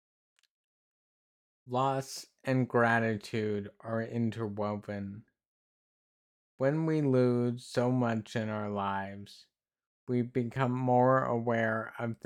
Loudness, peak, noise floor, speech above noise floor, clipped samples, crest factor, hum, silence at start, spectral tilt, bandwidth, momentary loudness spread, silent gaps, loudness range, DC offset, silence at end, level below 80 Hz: -31 LUFS; -14 dBFS; under -90 dBFS; over 59 dB; under 0.1%; 18 dB; none; 1.65 s; -7 dB/octave; 13.5 kHz; 13 LU; 5.46-6.58 s, 9.87-10.07 s; 5 LU; under 0.1%; 0.1 s; -76 dBFS